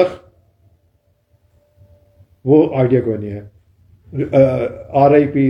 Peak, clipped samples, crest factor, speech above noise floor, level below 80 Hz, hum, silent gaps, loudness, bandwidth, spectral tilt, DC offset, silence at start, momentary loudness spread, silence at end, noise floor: 0 dBFS; under 0.1%; 16 dB; 46 dB; -50 dBFS; none; none; -15 LUFS; 6.4 kHz; -10 dB/octave; under 0.1%; 0 s; 16 LU; 0 s; -60 dBFS